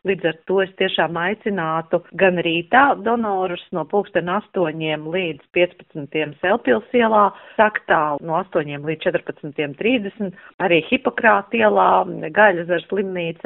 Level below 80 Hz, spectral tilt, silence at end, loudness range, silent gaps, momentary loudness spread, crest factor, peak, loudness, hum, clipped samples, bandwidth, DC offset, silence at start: -60 dBFS; -3 dB/octave; 0.1 s; 4 LU; 10.54-10.58 s; 10 LU; 18 dB; -2 dBFS; -19 LUFS; none; under 0.1%; 4 kHz; under 0.1%; 0.05 s